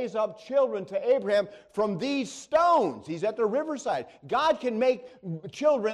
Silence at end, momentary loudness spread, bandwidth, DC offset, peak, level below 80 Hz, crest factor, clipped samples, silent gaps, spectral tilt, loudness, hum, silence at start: 0 s; 9 LU; 11 kHz; under 0.1%; -12 dBFS; -68 dBFS; 14 dB; under 0.1%; none; -5 dB/octave; -27 LUFS; none; 0 s